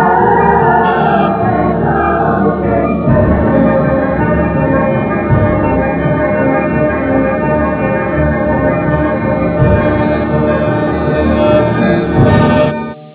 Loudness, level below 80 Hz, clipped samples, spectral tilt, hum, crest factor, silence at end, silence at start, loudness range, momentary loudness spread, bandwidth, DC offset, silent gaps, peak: -12 LUFS; -26 dBFS; under 0.1%; -12 dB/octave; none; 10 dB; 0 s; 0 s; 2 LU; 4 LU; 4 kHz; under 0.1%; none; 0 dBFS